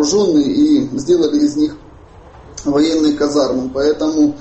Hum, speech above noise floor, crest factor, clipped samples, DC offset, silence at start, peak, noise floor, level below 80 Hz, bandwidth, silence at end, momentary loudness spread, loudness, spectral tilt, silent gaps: none; 26 dB; 12 dB; under 0.1%; under 0.1%; 0 s; -2 dBFS; -39 dBFS; -44 dBFS; 8.4 kHz; 0 s; 6 LU; -15 LUFS; -5 dB/octave; none